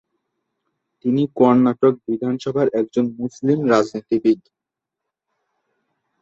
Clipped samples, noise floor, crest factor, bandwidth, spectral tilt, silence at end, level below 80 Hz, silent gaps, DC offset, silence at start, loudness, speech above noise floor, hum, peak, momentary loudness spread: under 0.1%; -83 dBFS; 18 dB; 7.6 kHz; -7.5 dB/octave; 1.85 s; -62 dBFS; none; under 0.1%; 1.05 s; -19 LUFS; 65 dB; none; -2 dBFS; 9 LU